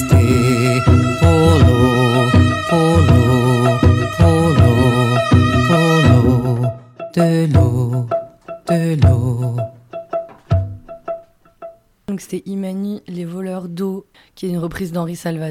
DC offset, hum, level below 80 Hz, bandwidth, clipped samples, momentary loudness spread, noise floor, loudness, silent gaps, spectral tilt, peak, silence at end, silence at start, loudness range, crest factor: under 0.1%; none; -30 dBFS; 15 kHz; under 0.1%; 16 LU; -39 dBFS; -15 LUFS; none; -7 dB/octave; -2 dBFS; 0 s; 0 s; 13 LU; 12 dB